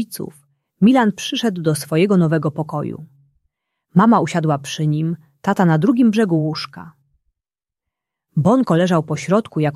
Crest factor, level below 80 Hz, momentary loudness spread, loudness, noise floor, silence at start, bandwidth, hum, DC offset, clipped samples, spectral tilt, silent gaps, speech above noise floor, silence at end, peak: 16 dB; -60 dBFS; 12 LU; -17 LUFS; -87 dBFS; 0 s; 13.5 kHz; none; under 0.1%; under 0.1%; -6.5 dB/octave; none; 70 dB; 0 s; -2 dBFS